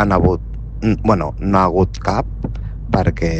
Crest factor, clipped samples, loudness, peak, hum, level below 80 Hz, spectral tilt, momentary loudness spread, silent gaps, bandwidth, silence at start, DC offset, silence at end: 16 dB; under 0.1%; -18 LUFS; -2 dBFS; none; -26 dBFS; -8 dB/octave; 12 LU; none; 8.4 kHz; 0 s; under 0.1%; 0 s